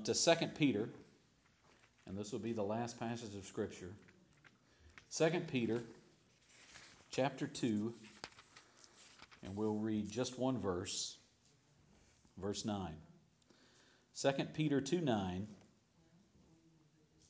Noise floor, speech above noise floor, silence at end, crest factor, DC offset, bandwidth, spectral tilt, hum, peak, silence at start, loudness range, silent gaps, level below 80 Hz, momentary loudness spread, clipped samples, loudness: -72 dBFS; 33 dB; 1.75 s; 24 dB; under 0.1%; 8 kHz; -4.5 dB/octave; none; -18 dBFS; 0 s; 5 LU; none; -70 dBFS; 22 LU; under 0.1%; -40 LUFS